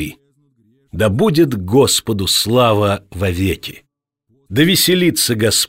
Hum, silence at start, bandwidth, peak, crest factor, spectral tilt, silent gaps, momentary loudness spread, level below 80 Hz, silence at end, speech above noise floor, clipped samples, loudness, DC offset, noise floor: none; 0 s; 16.5 kHz; -2 dBFS; 14 dB; -4 dB/octave; none; 10 LU; -42 dBFS; 0 s; 50 dB; under 0.1%; -14 LUFS; under 0.1%; -64 dBFS